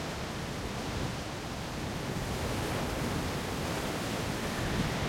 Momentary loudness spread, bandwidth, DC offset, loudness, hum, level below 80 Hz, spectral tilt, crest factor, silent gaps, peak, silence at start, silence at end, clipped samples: 4 LU; 16.5 kHz; under 0.1%; -34 LUFS; none; -46 dBFS; -4.5 dB/octave; 14 dB; none; -20 dBFS; 0 s; 0 s; under 0.1%